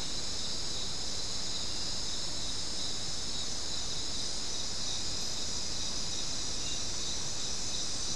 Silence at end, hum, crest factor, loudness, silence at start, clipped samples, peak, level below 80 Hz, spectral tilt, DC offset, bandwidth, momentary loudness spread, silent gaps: 0 s; none; 14 dB; -34 LUFS; 0 s; under 0.1%; -20 dBFS; -50 dBFS; -1 dB/octave; 2%; 12 kHz; 1 LU; none